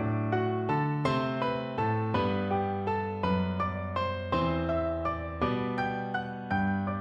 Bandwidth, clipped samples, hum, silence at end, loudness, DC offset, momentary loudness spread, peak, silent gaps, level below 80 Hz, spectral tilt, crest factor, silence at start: 9.4 kHz; under 0.1%; none; 0 s; -30 LUFS; under 0.1%; 3 LU; -14 dBFS; none; -50 dBFS; -8.5 dB/octave; 16 dB; 0 s